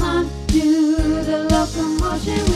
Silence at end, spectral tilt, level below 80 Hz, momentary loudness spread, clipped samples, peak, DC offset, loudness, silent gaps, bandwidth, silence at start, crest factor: 0 s; -5.5 dB/octave; -26 dBFS; 5 LU; under 0.1%; -4 dBFS; under 0.1%; -19 LUFS; none; 13.5 kHz; 0 s; 14 dB